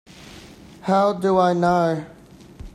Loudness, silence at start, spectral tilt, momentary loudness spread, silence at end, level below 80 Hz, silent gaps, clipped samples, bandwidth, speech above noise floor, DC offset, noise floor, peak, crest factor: -20 LUFS; 0.2 s; -7 dB/octave; 23 LU; 0.05 s; -50 dBFS; none; under 0.1%; 12.5 kHz; 24 dB; under 0.1%; -43 dBFS; -6 dBFS; 16 dB